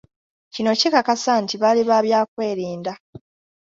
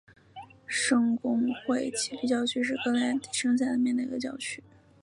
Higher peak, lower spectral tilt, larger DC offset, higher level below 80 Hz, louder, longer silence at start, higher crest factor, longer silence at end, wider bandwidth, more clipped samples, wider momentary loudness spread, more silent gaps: first, -2 dBFS vs -14 dBFS; about the same, -4 dB/octave vs -3 dB/octave; neither; first, -64 dBFS vs -70 dBFS; first, -19 LUFS vs -28 LUFS; first, 0.55 s vs 0.35 s; about the same, 18 dB vs 16 dB; about the same, 0.45 s vs 0.45 s; second, 7.8 kHz vs 11.5 kHz; neither; about the same, 13 LU vs 11 LU; first, 2.28-2.37 s, 3.00-3.13 s vs none